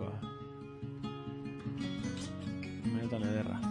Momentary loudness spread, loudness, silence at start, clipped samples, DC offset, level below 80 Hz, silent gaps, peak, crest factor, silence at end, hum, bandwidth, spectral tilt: 10 LU; -39 LUFS; 0 s; under 0.1%; under 0.1%; -62 dBFS; none; -22 dBFS; 16 dB; 0 s; none; 11 kHz; -6.5 dB/octave